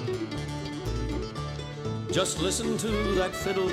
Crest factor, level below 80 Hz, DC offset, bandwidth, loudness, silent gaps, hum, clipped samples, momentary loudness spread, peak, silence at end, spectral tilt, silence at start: 16 dB; -40 dBFS; under 0.1%; 16 kHz; -30 LUFS; none; none; under 0.1%; 8 LU; -12 dBFS; 0 s; -4.5 dB/octave; 0 s